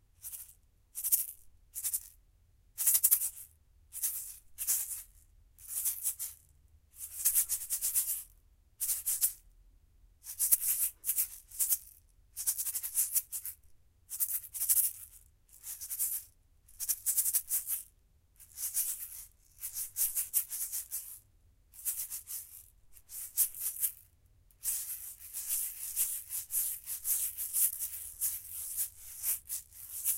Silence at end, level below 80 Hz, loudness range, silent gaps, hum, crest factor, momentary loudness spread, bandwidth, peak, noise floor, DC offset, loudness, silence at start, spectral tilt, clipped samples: 0 s; -66 dBFS; 5 LU; none; none; 30 dB; 18 LU; 16.5 kHz; -8 dBFS; -66 dBFS; under 0.1%; -32 LUFS; 0.2 s; 2.5 dB/octave; under 0.1%